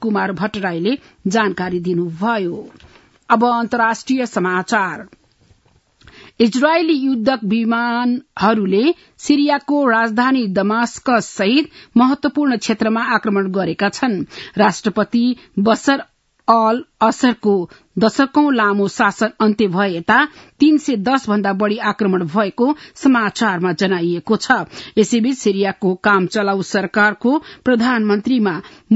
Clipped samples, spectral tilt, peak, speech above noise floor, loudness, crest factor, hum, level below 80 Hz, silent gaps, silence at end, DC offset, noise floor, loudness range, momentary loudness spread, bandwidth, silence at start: under 0.1%; -5.5 dB/octave; 0 dBFS; 39 dB; -17 LUFS; 16 dB; none; -58 dBFS; none; 0 s; under 0.1%; -55 dBFS; 3 LU; 6 LU; 8 kHz; 0 s